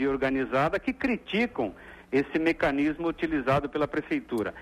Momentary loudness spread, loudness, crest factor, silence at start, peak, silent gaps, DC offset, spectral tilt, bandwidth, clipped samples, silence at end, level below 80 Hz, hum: 5 LU; -28 LUFS; 14 dB; 0 s; -14 dBFS; none; under 0.1%; -7 dB/octave; 14 kHz; under 0.1%; 0 s; -52 dBFS; none